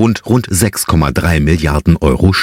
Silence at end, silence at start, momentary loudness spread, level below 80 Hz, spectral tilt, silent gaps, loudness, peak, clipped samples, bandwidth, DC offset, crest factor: 0 s; 0 s; 2 LU; -22 dBFS; -5.5 dB/octave; none; -12 LUFS; 0 dBFS; under 0.1%; 16.5 kHz; under 0.1%; 12 dB